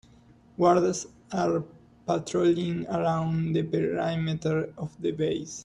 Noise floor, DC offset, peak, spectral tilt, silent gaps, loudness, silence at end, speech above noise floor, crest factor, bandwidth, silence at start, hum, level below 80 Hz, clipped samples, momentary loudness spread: -56 dBFS; under 0.1%; -8 dBFS; -6.5 dB/octave; none; -27 LUFS; 0 s; 29 dB; 20 dB; 10.5 kHz; 0.6 s; none; -60 dBFS; under 0.1%; 11 LU